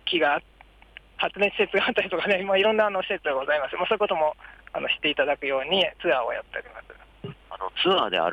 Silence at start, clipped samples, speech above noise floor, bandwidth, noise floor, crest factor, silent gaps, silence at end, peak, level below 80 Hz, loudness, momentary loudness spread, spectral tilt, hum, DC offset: 0.05 s; under 0.1%; 25 dB; 9 kHz; -50 dBFS; 16 dB; none; 0 s; -10 dBFS; -58 dBFS; -24 LUFS; 17 LU; -5.5 dB/octave; none; under 0.1%